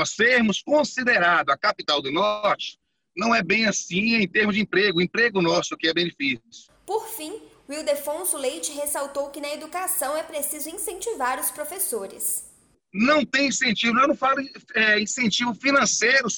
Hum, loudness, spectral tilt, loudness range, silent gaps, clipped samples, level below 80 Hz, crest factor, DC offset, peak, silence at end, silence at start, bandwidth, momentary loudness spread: none; -22 LUFS; -2.5 dB/octave; 6 LU; none; under 0.1%; -62 dBFS; 16 dB; under 0.1%; -8 dBFS; 0 s; 0 s; over 20 kHz; 11 LU